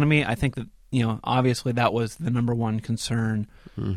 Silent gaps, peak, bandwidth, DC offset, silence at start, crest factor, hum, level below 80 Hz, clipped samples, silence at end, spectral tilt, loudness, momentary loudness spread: none; -6 dBFS; 14 kHz; 0.1%; 0 s; 18 dB; none; -46 dBFS; under 0.1%; 0 s; -6 dB/octave; -25 LUFS; 8 LU